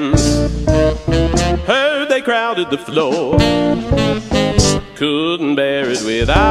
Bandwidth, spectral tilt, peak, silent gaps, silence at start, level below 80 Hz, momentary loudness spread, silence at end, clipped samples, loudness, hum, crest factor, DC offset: 14.5 kHz; -5 dB/octave; 0 dBFS; none; 0 s; -24 dBFS; 4 LU; 0 s; under 0.1%; -15 LUFS; none; 14 dB; under 0.1%